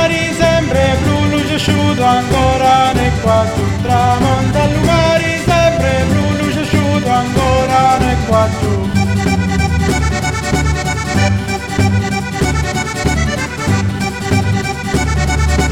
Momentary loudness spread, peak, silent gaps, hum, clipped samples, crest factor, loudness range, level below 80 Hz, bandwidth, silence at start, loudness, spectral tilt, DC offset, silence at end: 5 LU; 0 dBFS; none; none; under 0.1%; 12 dB; 3 LU; -24 dBFS; 16 kHz; 0 s; -14 LUFS; -5.5 dB/octave; under 0.1%; 0 s